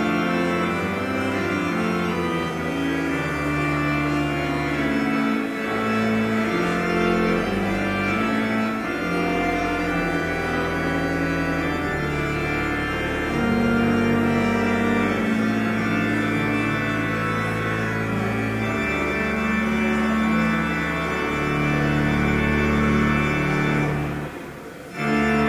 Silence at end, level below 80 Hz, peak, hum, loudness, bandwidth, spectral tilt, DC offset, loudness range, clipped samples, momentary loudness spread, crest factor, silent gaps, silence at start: 0 s; -38 dBFS; -8 dBFS; none; -22 LUFS; 16 kHz; -6.5 dB/octave; under 0.1%; 2 LU; under 0.1%; 4 LU; 14 dB; none; 0 s